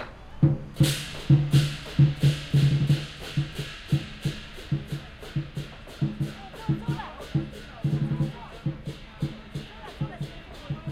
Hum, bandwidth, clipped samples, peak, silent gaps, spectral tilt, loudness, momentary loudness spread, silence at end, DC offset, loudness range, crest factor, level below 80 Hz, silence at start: none; 14.5 kHz; under 0.1%; -8 dBFS; none; -6.5 dB/octave; -27 LUFS; 16 LU; 0 s; under 0.1%; 9 LU; 18 dB; -44 dBFS; 0 s